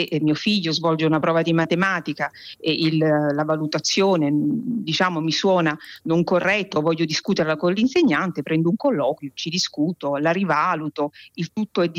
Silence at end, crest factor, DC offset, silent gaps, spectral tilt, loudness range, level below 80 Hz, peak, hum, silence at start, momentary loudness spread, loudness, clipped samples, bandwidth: 0 s; 12 dB; under 0.1%; none; -5 dB/octave; 1 LU; -66 dBFS; -8 dBFS; none; 0 s; 8 LU; -21 LUFS; under 0.1%; 15 kHz